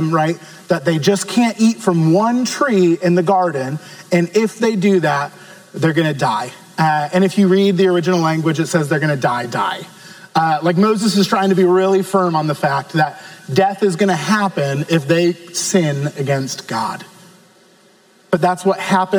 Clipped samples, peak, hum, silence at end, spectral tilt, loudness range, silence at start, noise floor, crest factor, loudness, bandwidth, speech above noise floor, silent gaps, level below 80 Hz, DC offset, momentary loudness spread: under 0.1%; 0 dBFS; none; 0 s; -5.5 dB/octave; 3 LU; 0 s; -51 dBFS; 16 dB; -16 LUFS; over 20 kHz; 35 dB; none; -66 dBFS; under 0.1%; 8 LU